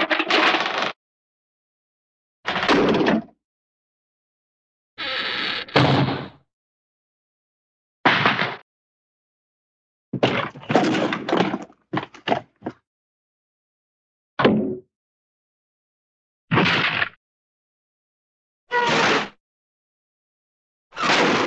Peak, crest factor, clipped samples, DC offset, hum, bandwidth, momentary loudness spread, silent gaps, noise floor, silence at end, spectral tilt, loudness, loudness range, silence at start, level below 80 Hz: -2 dBFS; 24 dB; under 0.1%; under 0.1%; none; 9 kHz; 15 LU; 0.96-2.43 s, 3.44-4.97 s, 6.53-8.04 s, 8.62-10.12 s, 12.87-14.37 s, 14.95-16.48 s, 17.16-18.67 s, 19.40-20.90 s; under -90 dBFS; 0 s; -5 dB/octave; -21 LUFS; 5 LU; 0 s; -60 dBFS